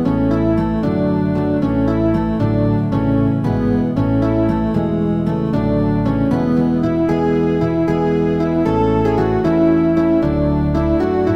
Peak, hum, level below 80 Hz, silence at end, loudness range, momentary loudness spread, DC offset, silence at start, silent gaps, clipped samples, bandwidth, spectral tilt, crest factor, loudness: -4 dBFS; none; -30 dBFS; 0 s; 1 LU; 3 LU; under 0.1%; 0 s; none; under 0.1%; 6.6 kHz; -9.5 dB/octave; 12 dB; -16 LUFS